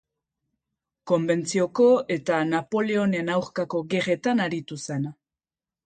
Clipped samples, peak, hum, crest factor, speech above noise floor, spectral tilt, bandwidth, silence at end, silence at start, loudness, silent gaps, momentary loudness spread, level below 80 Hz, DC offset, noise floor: under 0.1%; -10 dBFS; none; 16 dB; over 66 dB; -5.5 dB/octave; 9.2 kHz; 0.75 s; 1.05 s; -24 LUFS; none; 11 LU; -68 dBFS; under 0.1%; under -90 dBFS